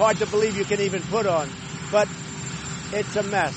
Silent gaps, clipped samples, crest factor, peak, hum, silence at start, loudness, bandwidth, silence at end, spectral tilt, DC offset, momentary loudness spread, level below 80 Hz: none; under 0.1%; 18 dB; -6 dBFS; none; 0 s; -25 LUFS; 8.8 kHz; 0 s; -4.5 dB/octave; under 0.1%; 10 LU; -52 dBFS